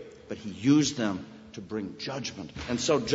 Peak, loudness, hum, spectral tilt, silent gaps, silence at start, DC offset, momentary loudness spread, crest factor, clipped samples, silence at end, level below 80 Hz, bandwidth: -10 dBFS; -29 LUFS; none; -4.5 dB/octave; none; 0 s; under 0.1%; 17 LU; 18 dB; under 0.1%; 0 s; -56 dBFS; 8 kHz